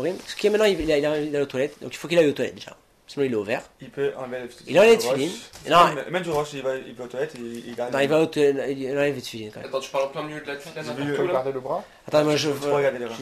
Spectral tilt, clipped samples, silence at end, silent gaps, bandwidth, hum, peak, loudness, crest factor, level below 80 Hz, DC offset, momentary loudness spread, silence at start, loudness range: -4.5 dB/octave; under 0.1%; 0 s; none; 15 kHz; none; -6 dBFS; -23 LUFS; 18 dB; -56 dBFS; under 0.1%; 15 LU; 0 s; 5 LU